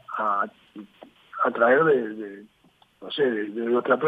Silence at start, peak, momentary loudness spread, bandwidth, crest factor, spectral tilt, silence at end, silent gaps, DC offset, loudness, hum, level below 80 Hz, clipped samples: 0.1 s; -6 dBFS; 25 LU; 4.9 kHz; 18 dB; -7.5 dB/octave; 0 s; none; under 0.1%; -24 LUFS; none; -76 dBFS; under 0.1%